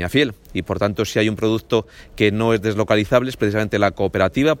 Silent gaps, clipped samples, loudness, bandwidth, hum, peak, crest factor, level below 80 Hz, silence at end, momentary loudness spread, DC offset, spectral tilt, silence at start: none; under 0.1%; -19 LUFS; 17 kHz; none; -2 dBFS; 16 dB; -44 dBFS; 0 s; 5 LU; under 0.1%; -6 dB/octave; 0 s